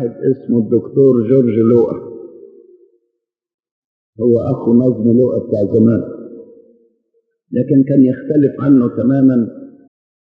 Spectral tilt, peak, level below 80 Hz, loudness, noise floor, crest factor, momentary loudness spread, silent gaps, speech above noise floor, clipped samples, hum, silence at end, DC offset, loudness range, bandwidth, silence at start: -12.5 dB/octave; 0 dBFS; -60 dBFS; -13 LUFS; -73 dBFS; 14 dB; 11 LU; 3.54-3.58 s, 3.71-4.13 s; 60 dB; under 0.1%; none; 0.65 s; under 0.1%; 4 LU; 3.2 kHz; 0 s